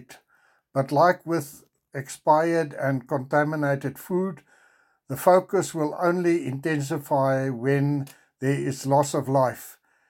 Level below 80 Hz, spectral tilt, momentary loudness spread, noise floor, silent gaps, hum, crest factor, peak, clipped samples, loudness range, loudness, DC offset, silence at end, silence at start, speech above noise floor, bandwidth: -72 dBFS; -6.5 dB/octave; 13 LU; -64 dBFS; none; none; 20 dB; -4 dBFS; under 0.1%; 2 LU; -24 LUFS; under 0.1%; 0.35 s; 0.1 s; 40 dB; 17 kHz